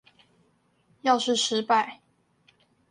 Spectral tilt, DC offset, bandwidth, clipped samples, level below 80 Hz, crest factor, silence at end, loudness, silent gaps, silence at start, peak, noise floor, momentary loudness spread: -2 dB/octave; under 0.1%; 11 kHz; under 0.1%; -78 dBFS; 20 dB; 0.95 s; -25 LUFS; none; 1.05 s; -10 dBFS; -67 dBFS; 7 LU